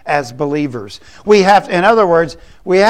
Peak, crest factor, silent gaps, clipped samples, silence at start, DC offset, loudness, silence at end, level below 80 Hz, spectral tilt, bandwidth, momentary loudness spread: 0 dBFS; 12 dB; none; under 0.1%; 0.05 s; 0.8%; -13 LUFS; 0 s; -46 dBFS; -5.5 dB/octave; 12.5 kHz; 18 LU